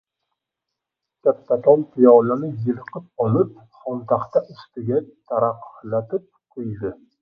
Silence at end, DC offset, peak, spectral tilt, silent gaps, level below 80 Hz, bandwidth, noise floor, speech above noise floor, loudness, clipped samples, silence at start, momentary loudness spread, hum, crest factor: 0.25 s; under 0.1%; 0 dBFS; -11.5 dB/octave; none; -62 dBFS; 5.2 kHz; -83 dBFS; 63 dB; -20 LUFS; under 0.1%; 1.25 s; 17 LU; none; 20 dB